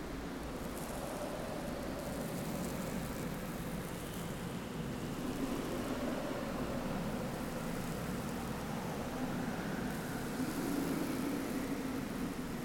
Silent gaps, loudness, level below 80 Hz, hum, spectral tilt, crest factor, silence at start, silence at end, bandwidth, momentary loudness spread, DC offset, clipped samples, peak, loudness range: none; -40 LUFS; -52 dBFS; none; -5.5 dB/octave; 14 dB; 0 s; 0 s; 18 kHz; 4 LU; under 0.1%; under 0.1%; -24 dBFS; 2 LU